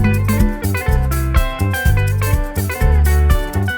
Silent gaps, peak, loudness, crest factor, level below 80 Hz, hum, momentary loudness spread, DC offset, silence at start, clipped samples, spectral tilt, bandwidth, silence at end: none; -4 dBFS; -17 LUFS; 12 dB; -18 dBFS; none; 5 LU; under 0.1%; 0 s; under 0.1%; -6 dB/octave; over 20 kHz; 0 s